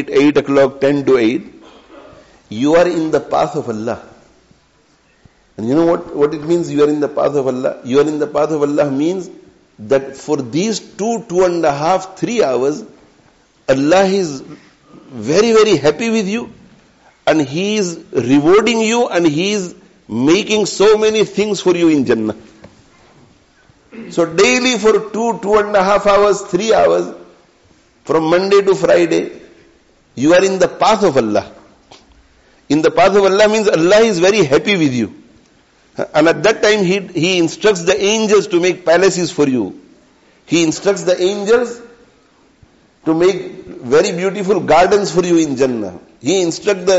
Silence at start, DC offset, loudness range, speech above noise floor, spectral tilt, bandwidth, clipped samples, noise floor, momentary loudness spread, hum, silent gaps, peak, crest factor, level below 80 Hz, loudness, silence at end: 0 s; under 0.1%; 5 LU; 40 dB; -4 dB/octave; 8 kHz; under 0.1%; -54 dBFS; 12 LU; none; none; -2 dBFS; 12 dB; -50 dBFS; -14 LUFS; 0 s